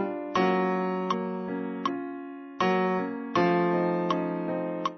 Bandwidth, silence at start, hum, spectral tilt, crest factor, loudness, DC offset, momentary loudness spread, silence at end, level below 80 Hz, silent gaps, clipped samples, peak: 6.4 kHz; 0 s; none; -7 dB/octave; 16 dB; -28 LUFS; under 0.1%; 8 LU; 0 s; -72 dBFS; none; under 0.1%; -10 dBFS